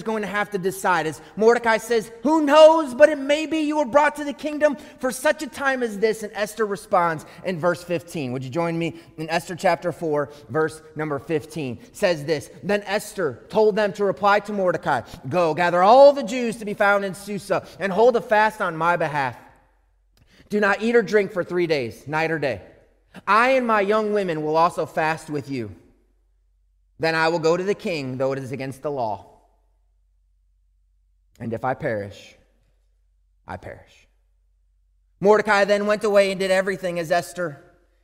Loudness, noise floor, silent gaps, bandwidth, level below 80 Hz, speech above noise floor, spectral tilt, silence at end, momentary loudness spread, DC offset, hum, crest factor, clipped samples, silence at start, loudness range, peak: -21 LUFS; -62 dBFS; none; 16 kHz; -58 dBFS; 41 dB; -5 dB/octave; 0.45 s; 12 LU; under 0.1%; none; 20 dB; under 0.1%; 0 s; 14 LU; -2 dBFS